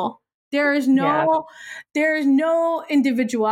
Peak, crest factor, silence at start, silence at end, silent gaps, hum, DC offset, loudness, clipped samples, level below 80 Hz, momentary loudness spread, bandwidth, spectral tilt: -8 dBFS; 12 dB; 0 s; 0 s; 0.34-0.51 s; none; under 0.1%; -20 LUFS; under 0.1%; -70 dBFS; 10 LU; 13 kHz; -5.5 dB/octave